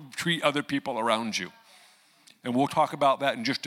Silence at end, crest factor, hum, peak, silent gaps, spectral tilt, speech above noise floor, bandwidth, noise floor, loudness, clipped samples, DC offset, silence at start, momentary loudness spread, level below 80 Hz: 0 s; 20 dB; none; -8 dBFS; none; -4 dB/octave; 32 dB; 16.5 kHz; -59 dBFS; -27 LUFS; under 0.1%; under 0.1%; 0 s; 8 LU; -76 dBFS